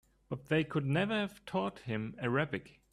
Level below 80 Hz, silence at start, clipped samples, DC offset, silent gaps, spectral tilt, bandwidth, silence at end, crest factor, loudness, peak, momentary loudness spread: -66 dBFS; 0.3 s; under 0.1%; under 0.1%; none; -7 dB/octave; 12.5 kHz; 0.25 s; 18 dB; -35 LUFS; -18 dBFS; 9 LU